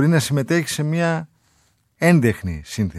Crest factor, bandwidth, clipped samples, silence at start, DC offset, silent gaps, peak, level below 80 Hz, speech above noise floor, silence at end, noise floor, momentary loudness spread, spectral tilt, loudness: 18 dB; 14 kHz; under 0.1%; 0 s; under 0.1%; none; -2 dBFS; -46 dBFS; 43 dB; 0 s; -62 dBFS; 12 LU; -6 dB/octave; -20 LUFS